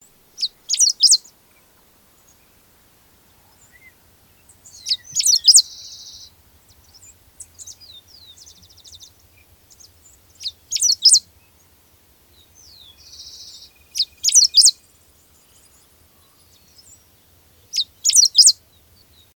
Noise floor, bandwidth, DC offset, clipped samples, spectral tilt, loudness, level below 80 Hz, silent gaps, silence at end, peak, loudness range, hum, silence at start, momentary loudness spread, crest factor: -54 dBFS; 19.5 kHz; under 0.1%; under 0.1%; 4 dB/octave; -13 LUFS; -62 dBFS; none; 0.85 s; 0 dBFS; 10 LU; none; 0.4 s; 28 LU; 22 dB